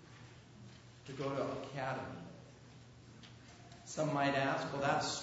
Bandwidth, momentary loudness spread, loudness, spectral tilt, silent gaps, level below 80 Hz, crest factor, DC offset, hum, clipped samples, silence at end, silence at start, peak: 7.6 kHz; 23 LU; -37 LUFS; -4 dB/octave; none; -70 dBFS; 20 dB; under 0.1%; none; under 0.1%; 0 s; 0 s; -20 dBFS